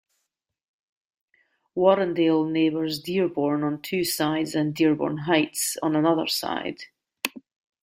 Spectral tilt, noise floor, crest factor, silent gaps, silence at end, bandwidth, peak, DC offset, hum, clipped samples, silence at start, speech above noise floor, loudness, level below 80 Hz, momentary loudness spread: -4.5 dB/octave; -79 dBFS; 20 dB; none; 0.45 s; 16 kHz; -4 dBFS; under 0.1%; none; under 0.1%; 1.75 s; 55 dB; -24 LUFS; -66 dBFS; 10 LU